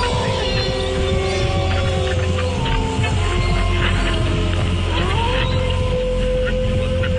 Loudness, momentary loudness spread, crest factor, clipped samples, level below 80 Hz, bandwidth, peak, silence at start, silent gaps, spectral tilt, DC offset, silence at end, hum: -19 LUFS; 2 LU; 12 dB; under 0.1%; -24 dBFS; 10 kHz; -6 dBFS; 0 s; none; -5.5 dB/octave; under 0.1%; 0 s; none